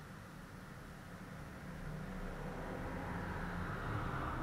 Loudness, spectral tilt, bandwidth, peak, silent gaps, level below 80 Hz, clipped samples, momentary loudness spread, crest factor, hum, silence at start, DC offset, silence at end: -45 LUFS; -6.5 dB/octave; 16 kHz; -28 dBFS; none; -52 dBFS; under 0.1%; 11 LU; 16 dB; none; 0 s; under 0.1%; 0 s